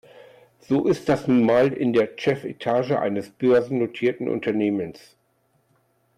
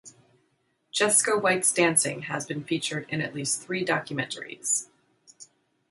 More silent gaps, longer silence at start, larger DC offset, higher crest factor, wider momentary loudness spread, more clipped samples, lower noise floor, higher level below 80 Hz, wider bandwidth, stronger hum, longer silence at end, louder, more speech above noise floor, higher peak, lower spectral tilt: neither; first, 0.7 s vs 0.05 s; neither; second, 14 dB vs 20 dB; second, 7 LU vs 11 LU; neither; second, -66 dBFS vs -72 dBFS; first, -62 dBFS vs -72 dBFS; about the same, 13 kHz vs 12 kHz; neither; first, 1.25 s vs 0.45 s; first, -22 LUFS vs -25 LUFS; about the same, 45 dB vs 45 dB; about the same, -10 dBFS vs -8 dBFS; first, -7.5 dB/octave vs -2.5 dB/octave